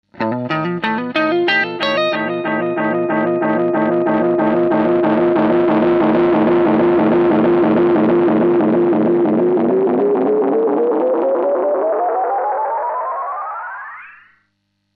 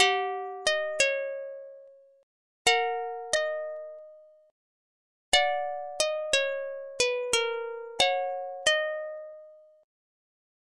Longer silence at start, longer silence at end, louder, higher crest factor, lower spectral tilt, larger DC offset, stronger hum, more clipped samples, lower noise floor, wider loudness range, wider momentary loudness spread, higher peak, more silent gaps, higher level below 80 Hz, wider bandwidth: first, 0.15 s vs 0 s; second, 0.85 s vs 1.1 s; first, -15 LUFS vs -28 LUFS; second, 12 dB vs 22 dB; first, -8.5 dB/octave vs 0.5 dB/octave; neither; neither; neither; first, -68 dBFS vs -53 dBFS; about the same, 4 LU vs 4 LU; second, 7 LU vs 16 LU; first, -2 dBFS vs -8 dBFS; second, none vs 2.23-2.65 s, 4.51-5.32 s; first, -54 dBFS vs -66 dBFS; second, 5.8 kHz vs 11.5 kHz